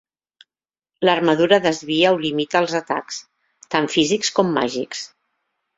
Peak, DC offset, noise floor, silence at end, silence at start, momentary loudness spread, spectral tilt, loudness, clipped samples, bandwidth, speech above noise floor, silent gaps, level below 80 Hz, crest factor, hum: -2 dBFS; under 0.1%; under -90 dBFS; 0.7 s; 1 s; 13 LU; -4 dB/octave; -19 LUFS; under 0.1%; 8 kHz; over 71 dB; none; -62 dBFS; 20 dB; none